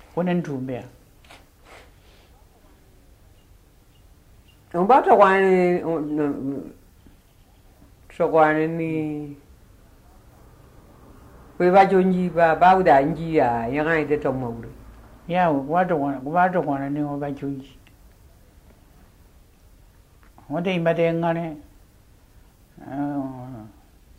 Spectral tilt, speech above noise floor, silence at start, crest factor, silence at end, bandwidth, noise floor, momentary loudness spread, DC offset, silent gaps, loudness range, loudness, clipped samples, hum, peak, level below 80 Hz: -8 dB/octave; 33 dB; 0.15 s; 20 dB; 0.5 s; 15.5 kHz; -53 dBFS; 19 LU; under 0.1%; none; 13 LU; -21 LUFS; under 0.1%; none; -4 dBFS; -52 dBFS